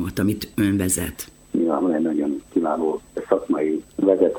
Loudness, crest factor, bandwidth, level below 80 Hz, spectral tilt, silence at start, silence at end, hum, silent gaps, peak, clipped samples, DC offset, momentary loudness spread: -22 LUFS; 18 dB; 19.5 kHz; -48 dBFS; -5.5 dB/octave; 0 s; 0 s; none; none; -4 dBFS; under 0.1%; under 0.1%; 5 LU